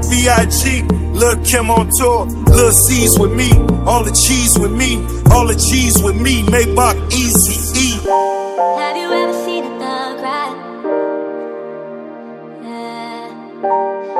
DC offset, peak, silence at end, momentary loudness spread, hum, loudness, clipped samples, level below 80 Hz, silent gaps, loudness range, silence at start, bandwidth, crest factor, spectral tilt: under 0.1%; 0 dBFS; 0 s; 17 LU; none; -13 LUFS; 0.3%; -22 dBFS; none; 12 LU; 0 s; 16.5 kHz; 14 dB; -4 dB/octave